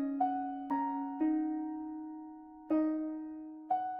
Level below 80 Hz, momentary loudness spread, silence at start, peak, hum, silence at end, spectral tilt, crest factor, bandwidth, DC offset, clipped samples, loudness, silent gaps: -74 dBFS; 14 LU; 0 s; -20 dBFS; none; 0 s; -5.5 dB/octave; 16 dB; 3.2 kHz; under 0.1%; under 0.1%; -36 LUFS; none